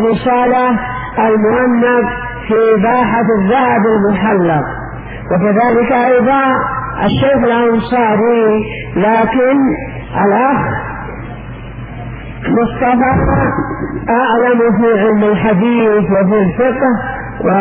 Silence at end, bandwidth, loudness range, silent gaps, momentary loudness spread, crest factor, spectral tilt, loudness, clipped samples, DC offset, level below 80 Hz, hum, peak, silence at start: 0 s; 4.9 kHz; 4 LU; none; 11 LU; 10 dB; -11 dB/octave; -12 LUFS; under 0.1%; under 0.1%; -32 dBFS; none; -2 dBFS; 0 s